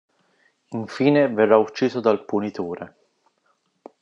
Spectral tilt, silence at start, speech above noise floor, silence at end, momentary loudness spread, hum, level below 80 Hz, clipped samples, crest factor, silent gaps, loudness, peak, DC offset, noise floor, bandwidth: -7 dB/octave; 0.7 s; 48 dB; 1.15 s; 16 LU; none; -74 dBFS; under 0.1%; 20 dB; none; -21 LUFS; -2 dBFS; under 0.1%; -68 dBFS; 7.8 kHz